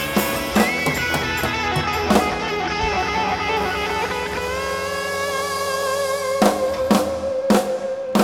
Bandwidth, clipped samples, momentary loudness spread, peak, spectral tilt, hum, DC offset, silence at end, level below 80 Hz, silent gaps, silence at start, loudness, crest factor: 19 kHz; under 0.1%; 5 LU; -2 dBFS; -4 dB/octave; none; under 0.1%; 0 s; -40 dBFS; none; 0 s; -21 LUFS; 20 dB